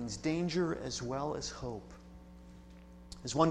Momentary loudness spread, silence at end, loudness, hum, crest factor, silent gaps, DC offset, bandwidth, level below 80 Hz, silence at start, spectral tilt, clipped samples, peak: 22 LU; 0 s; -37 LUFS; none; 24 dB; none; under 0.1%; 11.5 kHz; -56 dBFS; 0 s; -5 dB/octave; under 0.1%; -14 dBFS